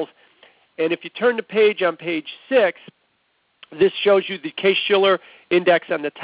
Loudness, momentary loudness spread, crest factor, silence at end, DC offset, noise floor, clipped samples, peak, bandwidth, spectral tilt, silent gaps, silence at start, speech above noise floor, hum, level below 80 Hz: -19 LUFS; 9 LU; 18 dB; 0 s; under 0.1%; -66 dBFS; under 0.1%; -4 dBFS; 4 kHz; -8.5 dB/octave; none; 0 s; 47 dB; none; -68 dBFS